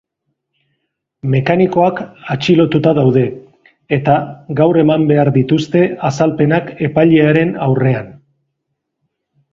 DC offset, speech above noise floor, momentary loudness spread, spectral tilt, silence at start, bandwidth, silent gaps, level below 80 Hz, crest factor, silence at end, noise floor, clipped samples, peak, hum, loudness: under 0.1%; 61 dB; 9 LU; -8 dB/octave; 1.25 s; 7.4 kHz; none; -50 dBFS; 14 dB; 1.4 s; -73 dBFS; under 0.1%; 0 dBFS; none; -13 LUFS